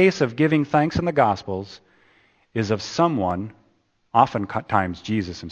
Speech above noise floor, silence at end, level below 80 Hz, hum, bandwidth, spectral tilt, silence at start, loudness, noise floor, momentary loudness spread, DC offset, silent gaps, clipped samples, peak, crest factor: 43 dB; 0 s; -50 dBFS; none; 8.6 kHz; -6.5 dB/octave; 0 s; -22 LUFS; -65 dBFS; 12 LU; under 0.1%; none; under 0.1%; -2 dBFS; 20 dB